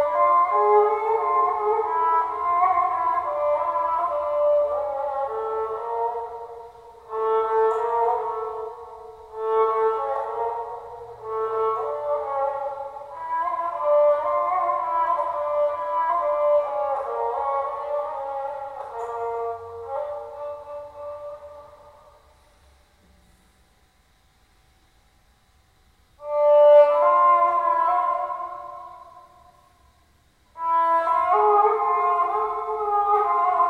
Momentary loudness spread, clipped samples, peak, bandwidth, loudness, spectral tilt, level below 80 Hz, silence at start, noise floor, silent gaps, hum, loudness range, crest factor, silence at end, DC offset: 17 LU; under 0.1%; -6 dBFS; 5 kHz; -22 LUFS; -5 dB/octave; -62 dBFS; 0 s; -61 dBFS; none; none; 13 LU; 18 dB; 0 s; under 0.1%